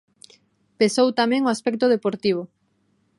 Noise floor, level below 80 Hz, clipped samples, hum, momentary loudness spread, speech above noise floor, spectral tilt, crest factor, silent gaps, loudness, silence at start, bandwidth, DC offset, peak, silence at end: -66 dBFS; -70 dBFS; under 0.1%; none; 6 LU; 46 dB; -4.5 dB/octave; 18 dB; none; -21 LUFS; 0.8 s; 11.5 kHz; under 0.1%; -4 dBFS; 0.7 s